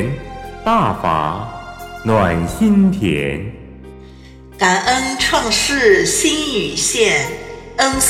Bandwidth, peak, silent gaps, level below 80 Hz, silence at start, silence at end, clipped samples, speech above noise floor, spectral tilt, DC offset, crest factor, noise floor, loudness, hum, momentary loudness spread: 16 kHz; 0 dBFS; none; -36 dBFS; 0 s; 0 s; under 0.1%; 23 dB; -3.5 dB/octave; under 0.1%; 16 dB; -38 dBFS; -15 LUFS; none; 16 LU